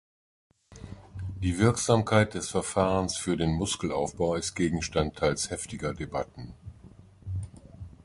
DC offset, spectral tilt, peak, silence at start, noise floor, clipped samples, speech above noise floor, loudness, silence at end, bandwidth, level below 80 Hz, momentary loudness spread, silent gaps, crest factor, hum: under 0.1%; -5 dB/octave; -8 dBFS; 0.7 s; -52 dBFS; under 0.1%; 24 dB; -28 LUFS; 0.15 s; 11.5 kHz; -46 dBFS; 21 LU; none; 22 dB; none